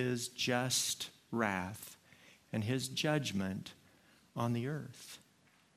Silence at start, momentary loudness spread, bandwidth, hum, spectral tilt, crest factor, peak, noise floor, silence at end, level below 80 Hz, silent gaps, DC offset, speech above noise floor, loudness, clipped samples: 0 s; 18 LU; 15.5 kHz; none; -4 dB/octave; 22 dB; -16 dBFS; -69 dBFS; 0.6 s; -76 dBFS; none; under 0.1%; 32 dB; -36 LUFS; under 0.1%